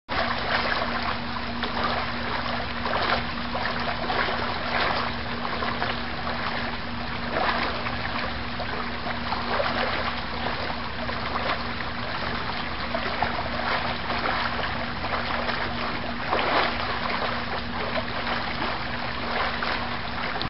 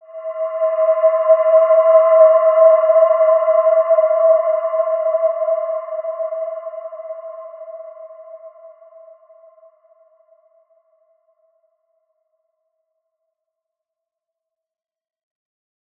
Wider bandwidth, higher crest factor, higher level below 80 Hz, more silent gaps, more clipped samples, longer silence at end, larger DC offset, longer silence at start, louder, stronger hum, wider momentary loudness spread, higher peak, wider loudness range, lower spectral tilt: first, 6 kHz vs 3 kHz; first, 22 dB vs 16 dB; first, -42 dBFS vs under -90 dBFS; neither; neither; second, 0 s vs 7.3 s; first, 2% vs under 0.1%; about the same, 0.1 s vs 0.1 s; second, -27 LUFS vs -14 LUFS; neither; second, 5 LU vs 20 LU; second, -6 dBFS vs -2 dBFS; second, 2 LU vs 20 LU; second, -2 dB/octave vs -3.5 dB/octave